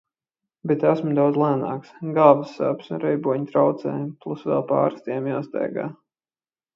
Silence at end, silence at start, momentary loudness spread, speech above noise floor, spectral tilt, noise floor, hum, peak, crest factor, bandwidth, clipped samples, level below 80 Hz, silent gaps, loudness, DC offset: 0.85 s; 0.65 s; 13 LU; over 68 dB; -9.5 dB/octave; under -90 dBFS; none; 0 dBFS; 22 dB; 7 kHz; under 0.1%; -72 dBFS; none; -22 LUFS; under 0.1%